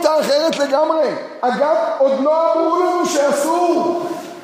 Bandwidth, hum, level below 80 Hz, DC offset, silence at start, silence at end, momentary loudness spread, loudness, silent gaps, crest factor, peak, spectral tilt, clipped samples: 15.5 kHz; none; -72 dBFS; under 0.1%; 0 s; 0 s; 6 LU; -16 LUFS; none; 14 dB; -2 dBFS; -3.5 dB/octave; under 0.1%